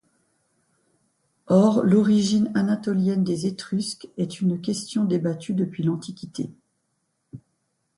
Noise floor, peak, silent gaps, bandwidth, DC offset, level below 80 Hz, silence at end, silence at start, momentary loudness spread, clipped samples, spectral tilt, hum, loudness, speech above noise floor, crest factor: -74 dBFS; -6 dBFS; none; 11.5 kHz; under 0.1%; -64 dBFS; 0.6 s; 1.5 s; 14 LU; under 0.1%; -6.5 dB/octave; none; -23 LUFS; 52 dB; 18 dB